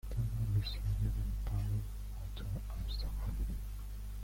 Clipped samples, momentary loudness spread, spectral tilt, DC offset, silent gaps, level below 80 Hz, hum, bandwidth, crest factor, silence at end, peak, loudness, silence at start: under 0.1%; 10 LU; -6.5 dB/octave; under 0.1%; none; -40 dBFS; 50 Hz at -40 dBFS; 16.5 kHz; 14 dB; 0 s; -24 dBFS; -40 LUFS; 0.05 s